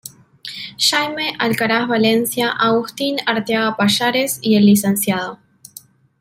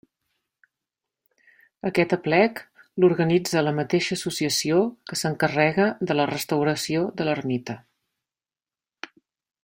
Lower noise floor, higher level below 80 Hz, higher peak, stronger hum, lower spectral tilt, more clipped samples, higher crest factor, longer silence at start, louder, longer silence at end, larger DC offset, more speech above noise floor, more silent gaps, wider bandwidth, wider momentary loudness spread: second, -44 dBFS vs under -90 dBFS; about the same, -60 dBFS vs -64 dBFS; about the same, -2 dBFS vs -4 dBFS; neither; about the same, -4 dB/octave vs -5 dB/octave; neither; second, 16 dB vs 22 dB; second, 0.05 s vs 1.85 s; first, -16 LUFS vs -23 LUFS; second, 0.85 s vs 1.85 s; neither; second, 27 dB vs over 67 dB; neither; about the same, 16 kHz vs 16.5 kHz; about the same, 14 LU vs 16 LU